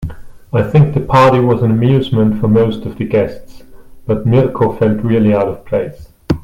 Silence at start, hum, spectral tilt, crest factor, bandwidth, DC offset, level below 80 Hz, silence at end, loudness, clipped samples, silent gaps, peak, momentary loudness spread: 0 s; none; -9 dB/octave; 12 dB; 12 kHz; under 0.1%; -36 dBFS; 0 s; -13 LUFS; under 0.1%; none; 0 dBFS; 10 LU